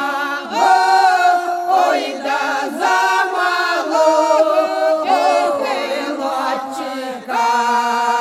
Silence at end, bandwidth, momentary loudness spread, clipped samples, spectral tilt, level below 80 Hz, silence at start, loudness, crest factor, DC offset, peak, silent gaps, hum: 0 s; 15 kHz; 8 LU; under 0.1%; -1.5 dB/octave; -70 dBFS; 0 s; -16 LUFS; 14 dB; under 0.1%; -2 dBFS; none; none